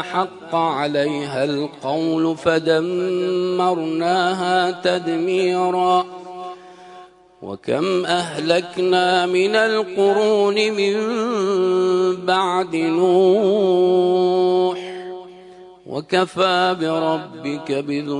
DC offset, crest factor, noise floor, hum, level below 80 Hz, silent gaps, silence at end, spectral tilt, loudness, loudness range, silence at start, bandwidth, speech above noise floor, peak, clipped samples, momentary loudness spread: under 0.1%; 16 dB; -44 dBFS; none; -66 dBFS; none; 0 s; -5.5 dB/octave; -19 LUFS; 5 LU; 0 s; 10.5 kHz; 26 dB; -4 dBFS; under 0.1%; 11 LU